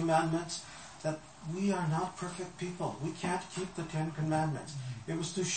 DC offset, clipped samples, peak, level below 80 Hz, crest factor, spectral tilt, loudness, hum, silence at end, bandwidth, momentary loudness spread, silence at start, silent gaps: under 0.1%; under 0.1%; -16 dBFS; -64 dBFS; 18 dB; -5 dB/octave; -36 LUFS; none; 0 s; 8.8 kHz; 9 LU; 0 s; none